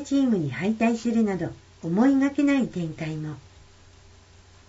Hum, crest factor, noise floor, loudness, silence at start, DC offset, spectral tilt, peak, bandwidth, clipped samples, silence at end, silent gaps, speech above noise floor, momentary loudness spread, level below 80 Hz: none; 16 dB; -52 dBFS; -24 LUFS; 0 s; under 0.1%; -7 dB/octave; -10 dBFS; 8 kHz; under 0.1%; 1.3 s; none; 28 dB; 14 LU; -56 dBFS